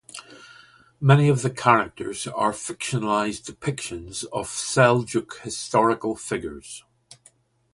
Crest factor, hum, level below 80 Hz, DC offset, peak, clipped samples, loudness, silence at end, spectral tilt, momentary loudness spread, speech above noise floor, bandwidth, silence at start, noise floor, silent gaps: 22 dB; none; -56 dBFS; under 0.1%; -2 dBFS; under 0.1%; -23 LUFS; 0.95 s; -5 dB/octave; 14 LU; 36 dB; 11.5 kHz; 0.15 s; -59 dBFS; none